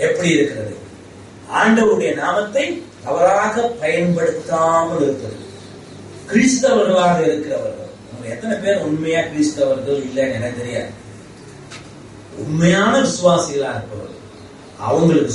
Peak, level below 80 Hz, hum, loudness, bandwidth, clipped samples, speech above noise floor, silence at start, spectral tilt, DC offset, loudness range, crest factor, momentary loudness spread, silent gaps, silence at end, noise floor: -2 dBFS; -52 dBFS; none; -17 LUFS; 11.5 kHz; under 0.1%; 22 dB; 0 s; -5 dB/octave; under 0.1%; 4 LU; 16 dB; 22 LU; none; 0 s; -38 dBFS